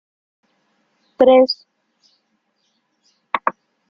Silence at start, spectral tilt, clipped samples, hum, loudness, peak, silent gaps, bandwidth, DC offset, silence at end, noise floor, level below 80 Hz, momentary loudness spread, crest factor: 1.2 s; -5.5 dB/octave; under 0.1%; none; -16 LUFS; -2 dBFS; none; 5.8 kHz; under 0.1%; 0.4 s; -68 dBFS; -64 dBFS; 14 LU; 20 dB